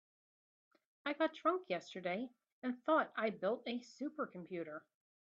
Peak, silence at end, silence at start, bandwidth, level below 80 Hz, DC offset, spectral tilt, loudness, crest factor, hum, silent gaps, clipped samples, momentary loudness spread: -22 dBFS; 0.5 s; 1.05 s; 7.6 kHz; -88 dBFS; under 0.1%; -3 dB/octave; -40 LUFS; 20 dB; none; 2.52-2.62 s; under 0.1%; 11 LU